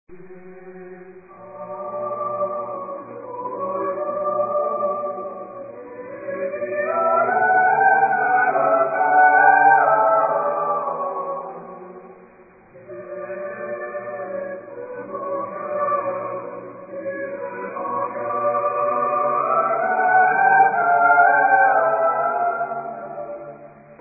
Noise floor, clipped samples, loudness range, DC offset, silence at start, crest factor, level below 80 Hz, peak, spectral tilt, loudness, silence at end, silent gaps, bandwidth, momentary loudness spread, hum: -48 dBFS; under 0.1%; 14 LU; under 0.1%; 0.1 s; 18 dB; -70 dBFS; -2 dBFS; -12.5 dB/octave; -19 LUFS; 0.05 s; none; 2.7 kHz; 20 LU; none